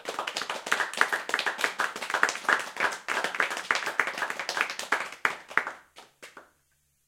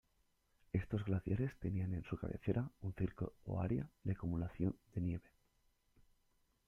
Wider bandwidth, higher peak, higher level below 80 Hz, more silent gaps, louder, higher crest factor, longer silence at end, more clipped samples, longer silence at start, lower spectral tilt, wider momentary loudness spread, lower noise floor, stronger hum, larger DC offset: first, 17 kHz vs 3.7 kHz; first, -2 dBFS vs -22 dBFS; second, -80 dBFS vs -58 dBFS; neither; first, -28 LUFS vs -42 LUFS; first, 28 dB vs 20 dB; second, 0.65 s vs 1.45 s; neither; second, 0 s vs 0.75 s; second, 0 dB/octave vs -10 dB/octave; first, 7 LU vs 4 LU; second, -71 dBFS vs -78 dBFS; neither; neither